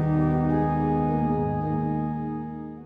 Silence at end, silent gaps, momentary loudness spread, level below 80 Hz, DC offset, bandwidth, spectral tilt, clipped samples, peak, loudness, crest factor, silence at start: 0 s; none; 9 LU; -42 dBFS; under 0.1%; 3.9 kHz; -11.5 dB/octave; under 0.1%; -12 dBFS; -25 LUFS; 14 dB; 0 s